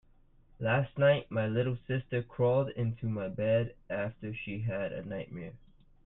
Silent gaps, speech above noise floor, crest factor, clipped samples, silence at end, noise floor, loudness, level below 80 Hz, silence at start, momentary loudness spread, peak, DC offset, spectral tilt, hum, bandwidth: none; 30 dB; 18 dB; under 0.1%; 0.5 s; -62 dBFS; -32 LUFS; -58 dBFS; 0.6 s; 13 LU; -14 dBFS; under 0.1%; -10.5 dB/octave; none; 4 kHz